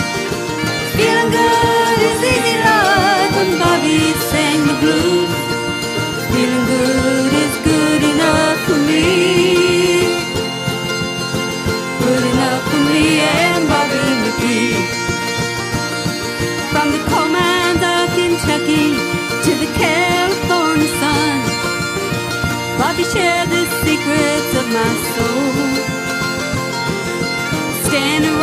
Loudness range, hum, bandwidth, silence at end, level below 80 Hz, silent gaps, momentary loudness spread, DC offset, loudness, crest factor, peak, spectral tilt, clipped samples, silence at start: 3 LU; none; 15.5 kHz; 0 s; -38 dBFS; none; 7 LU; under 0.1%; -15 LUFS; 14 dB; 0 dBFS; -4 dB/octave; under 0.1%; 0 s